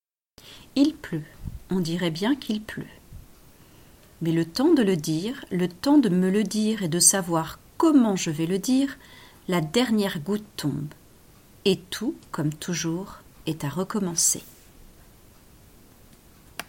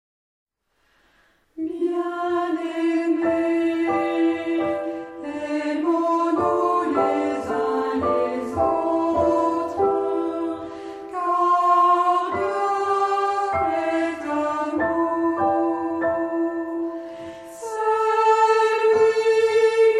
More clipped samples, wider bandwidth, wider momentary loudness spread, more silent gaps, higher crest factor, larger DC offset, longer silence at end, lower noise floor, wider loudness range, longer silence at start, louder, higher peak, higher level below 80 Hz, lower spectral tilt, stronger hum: neither; first, 17 kHz vs 11 kHz; first, 15 LU vs 11 LU; neither; first, 22 dB vs 14 dB; neither; about the same, 0.05 s vs 0 s; second, -53 dBFS vs -67 dBFS; first, 8 LU vs 3 LU; second, 0.45 s vs 1.55 s; about the same, -24 LUFS vs -22 LUFS; first, -4 dBFS vs -8 dBFS; about the same, -54 dBFS vs -56 dBFS; about the same, -4.5 dB/octave vs -5.5 dB/octave; neither